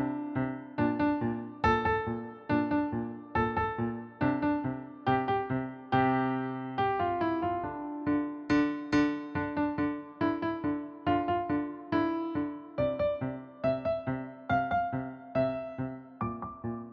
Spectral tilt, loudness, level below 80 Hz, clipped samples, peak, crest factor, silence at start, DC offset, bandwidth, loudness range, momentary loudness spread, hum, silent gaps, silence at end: -8 dB/octave; -32 LUFS; -54 dBFS; under 0.1%; -14 dBFS; 18 dB; 0 s; under 0.1%; 6.8 kHz; 2 LU; 8 LU; none; none; 0 s